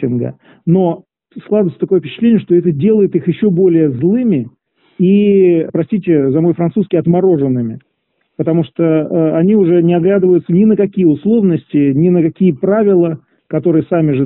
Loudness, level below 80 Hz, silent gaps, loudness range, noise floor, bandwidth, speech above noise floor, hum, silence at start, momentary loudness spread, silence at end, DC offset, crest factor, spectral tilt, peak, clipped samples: -12 LUFS; -52 dBFS; none; 3 LU; -65 dBFS; 4 kHz; 54 dB; none; 0 s; 7 LU; 0 s; under 0.1%; 10 dB; -9.5 dB/octave; -2 dBFS; under 0.1%